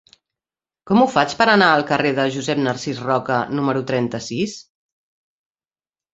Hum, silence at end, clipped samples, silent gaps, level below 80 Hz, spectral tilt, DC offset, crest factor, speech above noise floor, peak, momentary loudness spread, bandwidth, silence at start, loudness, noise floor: none; 1.55 s; under 0.1%; none; -60 dBFS; -5 dB/octave; under 0.1%; 20 dB; over 72 dB; -2 dBFS; 11 LU; 8 kHz; 0.85 s; -18 LUFS; under -90 dBFS